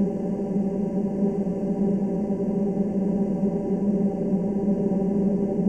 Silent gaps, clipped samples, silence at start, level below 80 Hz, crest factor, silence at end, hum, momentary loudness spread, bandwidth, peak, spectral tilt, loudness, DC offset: none; under 0.1%; 0 s; -50 dBFS; 12 dB; 0 s; none; 3 LU; 3 kHz; -12 dBFS; -11 dB/octave; -25 LUFS; 0.2%